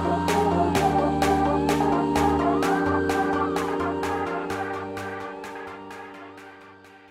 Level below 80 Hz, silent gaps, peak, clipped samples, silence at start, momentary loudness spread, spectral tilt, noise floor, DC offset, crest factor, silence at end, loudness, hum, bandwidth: -44 dBFS; none; -8 dBFS; under 0.1%; 0 s; 17 LU; -6 dB/octave; -48 dBFS; under 0.1%; 16 dB; 0.15 s; -24 LUFS; none; 16 kHz